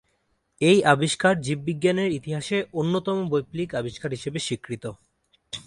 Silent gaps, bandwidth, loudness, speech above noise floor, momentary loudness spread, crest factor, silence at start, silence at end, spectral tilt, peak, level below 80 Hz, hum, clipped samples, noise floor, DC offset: none; 11.5 kHz; -24 LUFS; 47 dB; 12 LU; 22 dB; 0.6 s; 0.05 s; -5 dB/octave; -2 dBFS; -60 dBFS; none; under 0.1%; -71 dBFS; under 0.1%